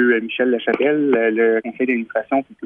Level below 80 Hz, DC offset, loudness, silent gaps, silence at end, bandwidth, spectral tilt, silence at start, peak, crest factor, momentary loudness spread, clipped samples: -68 dBFS; under 0.1%; -18 LUFS; none; 0 s; 4.5 kHz; -8 dB/octave; 0 s; -4 dBFS; 14 dB; 5 LU; under 0.1%